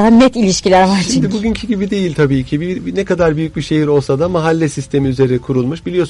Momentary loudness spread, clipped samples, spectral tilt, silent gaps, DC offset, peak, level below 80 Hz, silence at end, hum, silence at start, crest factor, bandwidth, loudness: 7 LU; under 0.1%; -6 dB/octave; none; under 0.1%; -2 dBFS; -36 dBFS; 0 s; none; 0 s; 12 dB; 11.5 kHz; -14 LUFS